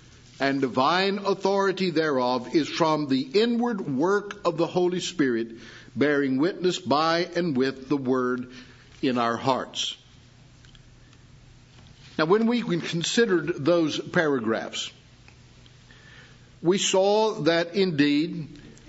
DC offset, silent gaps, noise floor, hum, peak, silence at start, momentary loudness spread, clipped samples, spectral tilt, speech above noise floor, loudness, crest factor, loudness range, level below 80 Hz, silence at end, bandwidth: under 0.1%; none; -52 dBFS; none; -6 dBFS; 0.4 s; 8 LU; under 0.1%; -4.5 dB/octave; 28 dB; -24 LUFS; 18 dB; 5 LU; -62 dBFS; 0.2 s; 8 kHz